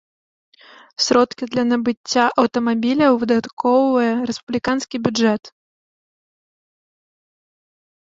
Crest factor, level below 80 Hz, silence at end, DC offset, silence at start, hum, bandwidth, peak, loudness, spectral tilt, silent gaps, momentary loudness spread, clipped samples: 18 dB; -60 dBFS; 2.5 s; under 0.1%; 1 s; none; 7.8 kHz; -2 dBFS; -18 LUFS; -4 dB/octave; 1.97-2.04 s, 3.53-3.57 s, 4.43-4.47 s; 7 LU; under 0.1%